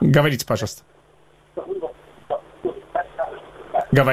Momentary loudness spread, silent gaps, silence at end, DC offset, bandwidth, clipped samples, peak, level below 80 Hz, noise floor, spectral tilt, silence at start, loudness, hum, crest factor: 18 LU; none; 0 s; under 0.1%; 16 kHz; under 0.1%; -2 dBFS; -50 dBFS; -54 dBFS; -6 dB/octave; 0 s; -24 LUFS; none; 22 dB